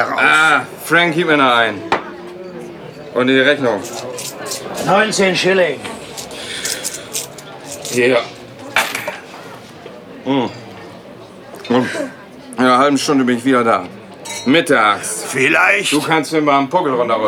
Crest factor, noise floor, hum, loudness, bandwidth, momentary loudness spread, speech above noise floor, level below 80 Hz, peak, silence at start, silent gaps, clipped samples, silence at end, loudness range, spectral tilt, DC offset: 16 dB; -36 dBFS; none; -15 LUFS; 17.5 kHz; 21 LU; 22 dB; -58 dBFS; 0 dBFS; 0 s; none; under 0.1%; 0 s; 8 LU; -3.5 dB/octave; under 0.1%